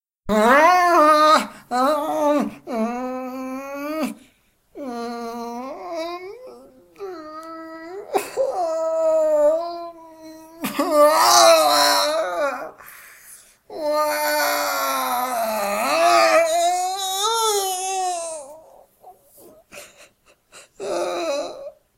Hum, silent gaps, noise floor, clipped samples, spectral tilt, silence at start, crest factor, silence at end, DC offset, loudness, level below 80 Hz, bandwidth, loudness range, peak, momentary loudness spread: none; none; -60 dBFS; under 0.1%; -1.5 dB/octave; 0.25 s; 18 dB; 0.25 s; under 0.1%; -19 LUFS; -58 dBFS; 16 kHz; 14 LU; -2 dBFS; 21 LU